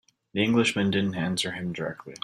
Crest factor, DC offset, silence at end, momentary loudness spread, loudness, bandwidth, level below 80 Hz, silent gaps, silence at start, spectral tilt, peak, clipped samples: 18 dB; under 0.1%; 0.05 s; 12 LU; -26 LUFS; 14 kHz; -62 dBFS; none; 0.35 s; -5 dB/octave; -10 dBFS; under 0.1%